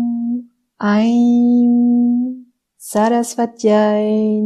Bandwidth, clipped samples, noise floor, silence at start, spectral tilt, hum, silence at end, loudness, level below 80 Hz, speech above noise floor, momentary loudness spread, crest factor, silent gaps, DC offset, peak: 13 kHz; under 0.1%; -36 dBFS; 0 s; -6 dB/octave; none; 0 s; -15 LUFS; -64 dBFS; 22 dB; 11 LU; 12 dB; none; under 0.1%; -4 dBFS